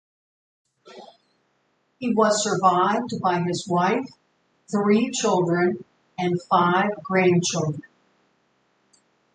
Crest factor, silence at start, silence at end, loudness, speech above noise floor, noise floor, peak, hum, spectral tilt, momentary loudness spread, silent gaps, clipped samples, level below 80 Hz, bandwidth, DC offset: 20 dB; 0.85 s; 1.55 s; -22 LUFS; 47 dB; -69 dBFS; -4 dBFS; none; -5 dB/octave; 10 LU; none; under 0.1%; -68 dBFS; 9.6 kHz; under 0.1%